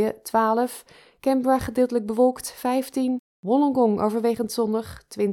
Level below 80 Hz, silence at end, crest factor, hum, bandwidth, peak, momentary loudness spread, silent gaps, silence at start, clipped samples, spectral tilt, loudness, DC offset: -54 dBFS; 0 s; 14 dB; none; 17.5 kHz; -8 dBFS; 8 LU; 3.19-3.43 s; 0 s; under 0.1%; -5.5 dB/octave; -23 LUFS; under 0.1%